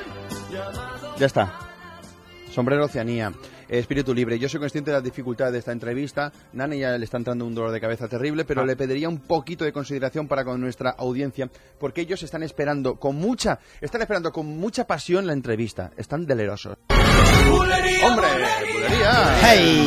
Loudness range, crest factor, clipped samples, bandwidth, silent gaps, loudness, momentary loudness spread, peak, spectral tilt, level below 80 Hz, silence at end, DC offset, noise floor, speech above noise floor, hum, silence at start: 9 LU; 20 dB; under 0.1%; 15.5 kHz; none; -22 LUFS; 15 LU; -2 dBFS; -5 dB/octave; -32 dBFS; 0 s; under 0.1%; -44 dBFS; 22 dB; none; 0 s